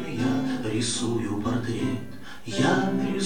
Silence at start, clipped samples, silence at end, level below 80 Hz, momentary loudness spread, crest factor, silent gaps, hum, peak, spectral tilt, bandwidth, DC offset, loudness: 0 s; under 0.1%; 0 s; -54 dBFS; 10 LU; 18 dB; none; none; -10 dBFS; -5 dB/octave; 17.5 kHz; 1%; -26 LUFS